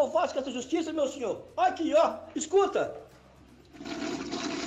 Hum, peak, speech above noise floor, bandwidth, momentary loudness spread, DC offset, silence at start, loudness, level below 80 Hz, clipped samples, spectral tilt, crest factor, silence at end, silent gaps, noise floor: none; -14 dBFS; 27 dB; 9.4 kHz; 11 LU; under 0.1%; 0 s; -29 LUFS; -64 dBFS; under 0.1%; -3.5 dB/octave; 16 dB; 0 s; none; -55 dBFS